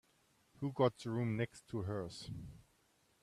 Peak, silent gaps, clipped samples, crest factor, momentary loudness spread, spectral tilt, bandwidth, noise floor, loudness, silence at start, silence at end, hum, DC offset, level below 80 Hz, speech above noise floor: -20 dBFS; none; under 0.1%; 22 dB; 14 LU; -7 dB/octave; 13 kHz; -74 dBFS; -40 LUFS; 0.6 s; 0.65 s; none; under 0.1%; -68 dBFS; 36 dB